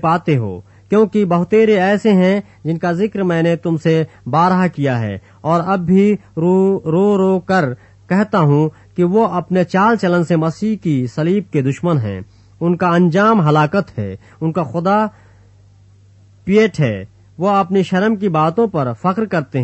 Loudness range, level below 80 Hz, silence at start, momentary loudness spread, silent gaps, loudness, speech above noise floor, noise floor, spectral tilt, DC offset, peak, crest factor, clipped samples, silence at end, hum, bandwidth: 3 LU; -52 dBFS; 0 s; 8 LU; none; -15 LUFS; 32 dB; -46 dBFS; -8 dB/octave; under 0.1%; -2 dBFS; 14 dB; under 0.1%; 0 s; none; 8.4 kHz